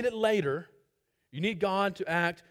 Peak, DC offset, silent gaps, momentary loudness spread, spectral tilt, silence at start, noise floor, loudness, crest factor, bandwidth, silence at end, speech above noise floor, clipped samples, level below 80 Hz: -14 dBFS; under 0.1%; none; 8 LU; -5.5 dB/octave; 0 s; -77 dBFS; -30 LUFS; 18 dB; 15.5 kHz; 0.15 s; 47 dB; under 0.1%; -68 dBFS